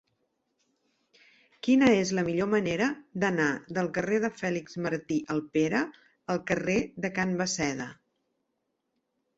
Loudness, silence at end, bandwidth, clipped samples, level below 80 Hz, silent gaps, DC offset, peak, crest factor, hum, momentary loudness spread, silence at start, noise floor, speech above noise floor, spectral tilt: -28 LUFS; 1.45 s; 8 kHz; under 0.1%; -62 dBFS; none; under 0.1%; -12 dBFS; 18 dB; none; 9 LU; 1.65 s; -80 dBFS; 52 dB; -5 dB/octave